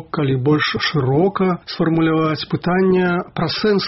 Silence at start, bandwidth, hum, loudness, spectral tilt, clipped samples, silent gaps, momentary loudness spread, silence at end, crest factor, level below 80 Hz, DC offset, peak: 0 s; 6 kHz; none; -18 LUFS; -5 dB/octave; under 0.1%; none; 5 LU; 0 s; 12 dB; -48 dBFS; under 0.1%; -6 dBFS